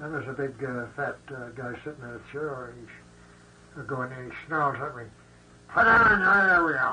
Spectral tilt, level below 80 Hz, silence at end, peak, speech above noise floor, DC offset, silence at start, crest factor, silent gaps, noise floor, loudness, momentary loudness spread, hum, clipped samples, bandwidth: -6.5 dB/octave; -54 dBFS; 0 s; -10 dBFS; 27 dB; under 0.1%; 0 s; 16 dB; none; -53 dBFS; -24 LUFS; 21 LU; none; under 0.1%; 10 kHz